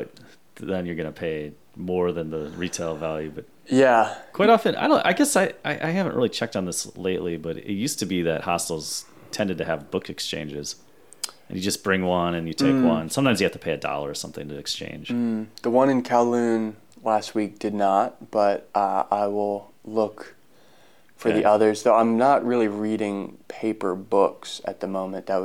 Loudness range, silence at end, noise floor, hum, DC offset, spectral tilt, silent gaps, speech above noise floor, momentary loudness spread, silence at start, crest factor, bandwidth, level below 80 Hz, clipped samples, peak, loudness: 6 LU; 0 s; -57 dBFS; none; 0.2%; -4.5 dB/octave; none; 33 dB; 13 LU; 0 s; 20 dB; 17 kHz; -62 dBFS; under 0.1%; -4 dBFS; -24 LUFS